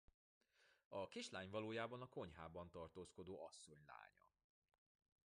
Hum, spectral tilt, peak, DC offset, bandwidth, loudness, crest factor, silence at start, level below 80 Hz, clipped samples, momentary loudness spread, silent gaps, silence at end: none; -4.5 dB/octave; -32 dBFS; under 0.1%; 11 kHz; -54 LUFS; 22 dB; 0.6 s; -76 dBFS; under 0.1%; 14 LU; 0.85-0.91 s; 1.2 s